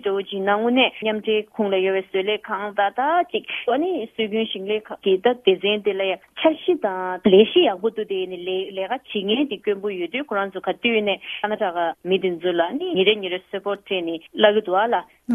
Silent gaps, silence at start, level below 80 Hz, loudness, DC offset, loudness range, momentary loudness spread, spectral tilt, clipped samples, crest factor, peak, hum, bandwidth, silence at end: none; 0.05 s; -66 dBFS; -22 LUFS; under 0.1%; 4 LU; 8 LU; -7 dB/octave; under 0.1%; 20 dB; -2 dBFS; none; 3.8 kHz; 0 s